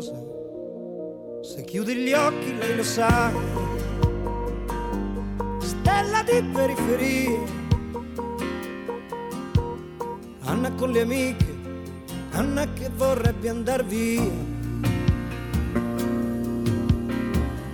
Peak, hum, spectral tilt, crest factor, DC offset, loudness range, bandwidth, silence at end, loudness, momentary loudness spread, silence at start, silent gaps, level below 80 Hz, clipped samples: -8 dBFS; none; -6 dB/octave; 16 dB; under 0.1%; 3 LU; 18 kHz; 0 s; -26 LUFS; 13 LU; 0 s; none; -36 dBFS; under 0.1%